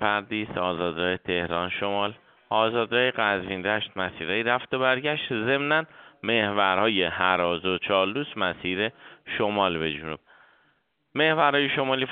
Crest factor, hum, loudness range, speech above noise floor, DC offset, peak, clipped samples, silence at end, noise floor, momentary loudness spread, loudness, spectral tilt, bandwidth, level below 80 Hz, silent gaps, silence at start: 20 dB; none; 3 LU; 43 dB; under 0.1%; -6 dBFS; under 0.1%; 0 s; -69 dBFS; 8 LU; -25 LUFS; -2 dB/octave; 4.7 kHz; -60 dBFS; none; 0 s